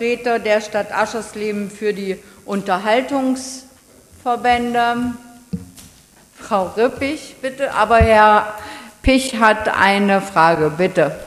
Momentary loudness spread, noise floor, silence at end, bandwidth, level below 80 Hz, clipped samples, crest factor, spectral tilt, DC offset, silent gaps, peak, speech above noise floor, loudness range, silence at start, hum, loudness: 15 LU; -48 dBFS; 0 s; 15 kHz; -36 dBFS; under 0.1%; 18 dB; -5 dB/octave; under 0.1%; none; 0 dBFS; 31 dB; 8 LU; 0 s; none; -17 LUFS